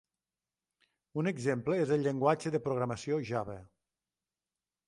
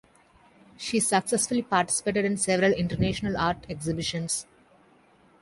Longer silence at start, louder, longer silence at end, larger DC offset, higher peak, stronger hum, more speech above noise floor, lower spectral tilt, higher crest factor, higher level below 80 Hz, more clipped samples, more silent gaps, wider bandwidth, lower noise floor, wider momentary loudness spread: first, 1.15 s vs 0.8 s; second, -33 LUFS vs -26 LUFS; first, 1.2 s vs 1 s; neither; second, -14 dBFS vs -6 dBFS; neither; first, over 58 dB vs 33 dB; first, -7 dB/octave vs -4 dB/octave; about the same, 22 dB vs 20 dB; second, -68 dBFS vs -50 dBFS; neither; neither; about the same, 11.5 kHz vs 12 kHz; first, under -90 dBFS vs -59 dBFS; about the same, 9 LU vs 7 LU